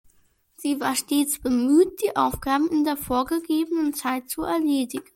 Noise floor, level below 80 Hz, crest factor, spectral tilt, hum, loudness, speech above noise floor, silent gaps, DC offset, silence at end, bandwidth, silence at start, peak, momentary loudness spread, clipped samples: -62 dBFS; -50 dBFS; 14 dB; -3.5 dB/octave; none; -23 LUFS; 39 dB; none; under 0.1%; 0.15 s; 16.5 kHz; 0.6 s; -8 dBFS; 8 LU; under 0.1%